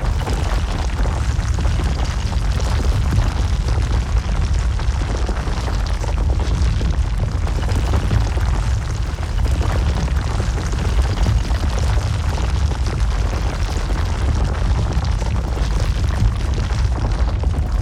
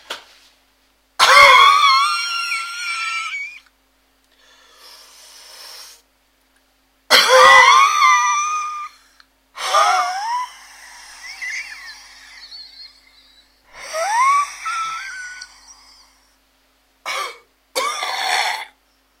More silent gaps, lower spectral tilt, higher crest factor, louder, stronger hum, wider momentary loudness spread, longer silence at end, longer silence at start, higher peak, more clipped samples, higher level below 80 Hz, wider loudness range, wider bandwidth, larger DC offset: neither; first, -6 dB/octave vs 1.5 dB/octave; about the same, 14 dB vs 18 dB; second, -20 LUFS vs -14 LUFS; second, none vs 50 Hz at -70 dBFS; second, 3 LU vs 27 LU; second, 0 s vs 0.55 s; about the same, 0 s vs 0.1 s; second, -4 dBFS vs 0 dBFS; neither; first, -20 dBFS vs -60 dBFS; second, 1 LU vs 16 LU; second, 11.5 kHz vs 16.5 kHz; neither